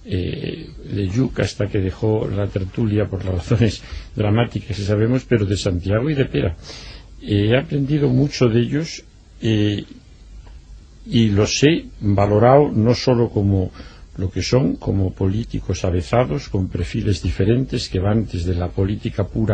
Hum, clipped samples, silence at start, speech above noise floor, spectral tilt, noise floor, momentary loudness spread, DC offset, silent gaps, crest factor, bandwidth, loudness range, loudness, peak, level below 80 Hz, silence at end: none; under 0.1%; 0 s; 22 dB; -6.5 dB/octave; -40 dBFS; 10 LU; under 0.1%; none; 18 dB; 9 kHz; 4 LU; -19 LUFS; 0 dBFS; -36 dBFS; 0 s